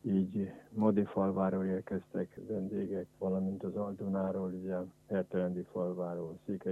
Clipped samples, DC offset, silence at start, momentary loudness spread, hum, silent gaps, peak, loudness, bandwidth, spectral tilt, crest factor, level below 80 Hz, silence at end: under 0.1%; under 0.1%; 0.05 s; 8 LU; none; none; -16 dBFS; -36 LUFS; 3.7 kHz; -10 dB/octave; 18 dB; -72 dBFS; 0 s